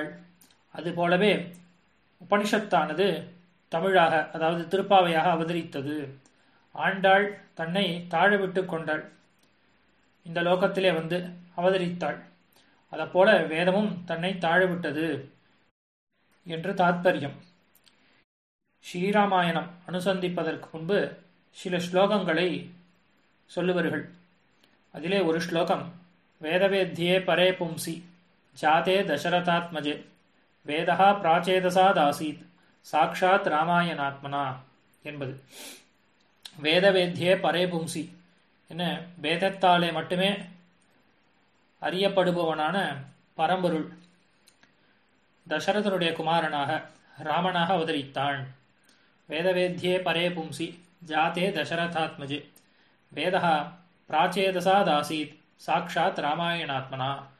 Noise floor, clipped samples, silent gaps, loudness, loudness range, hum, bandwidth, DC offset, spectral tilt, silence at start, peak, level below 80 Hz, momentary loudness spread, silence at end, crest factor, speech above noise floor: -67 dBFS; under 0.1%; 15.71-16.07 s, 18.24-18.59 s; -26 LUFS; 5 LU; none; 13 kHz; under 0.1%; -5.5 dB/octave; 0 s; -8 dBFS; -72 dBFS; 15 LU; 0.15 s; 20 dB; 41 dB